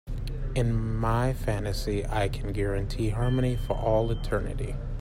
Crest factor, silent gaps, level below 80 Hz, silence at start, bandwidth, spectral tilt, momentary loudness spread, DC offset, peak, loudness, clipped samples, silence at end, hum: 14 dB; none; -32 dBFS; 0.05 s; 15.5 kHz; -7 dB/octave; 7 LU; under 0.1%; -12 dBFS; -29 LUFS; under 0.1%; 0 s; none